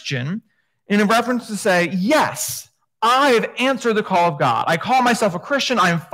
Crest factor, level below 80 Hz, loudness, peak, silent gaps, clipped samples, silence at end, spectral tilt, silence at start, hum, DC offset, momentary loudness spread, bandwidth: 14 dB; -64 dBFS; -18 LUFS; -4 dBFS; none; under 0.1%; 0.1 s; -4 dB/octave; 0.05 s; none; under 0.1%; 9 LU; 16 kHz